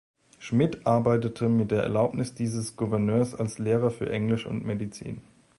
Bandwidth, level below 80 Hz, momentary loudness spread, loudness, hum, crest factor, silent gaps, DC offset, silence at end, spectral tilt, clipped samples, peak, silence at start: 11.5 kHz; -56 dBFS; 9 LU; -27 LUFS; none; 16 dB; none; under 0.1%; 0.35 s; -7 dB/octave; under 0.1%; -10 dBFS; 0.4 s